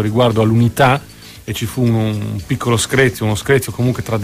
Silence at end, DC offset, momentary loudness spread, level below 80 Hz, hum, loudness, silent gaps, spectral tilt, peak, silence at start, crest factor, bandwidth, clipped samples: 0 s; under 0.1%; 10 LU; -40 dBFS; none; -16 LUFS; none; -5.5 dB/octave; 0 dBFS; 0 s; 14 dB; 15.5 kHz; under 0.1%